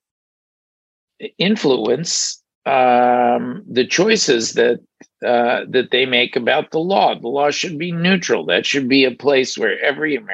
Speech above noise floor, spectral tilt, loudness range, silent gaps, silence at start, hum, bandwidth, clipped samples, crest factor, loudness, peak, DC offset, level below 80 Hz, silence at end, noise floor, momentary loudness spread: over 73 dB; -3.5 dB/octave; 1 LU; 2.55-2.61 s; 1.2 s; none; 8.8 kHz; under 0.1%; 16 dB; -16 LUFS; -2 dBFS; under 0.1%; -68 dBFS; 0 s; under -90 dBFS; 7 LU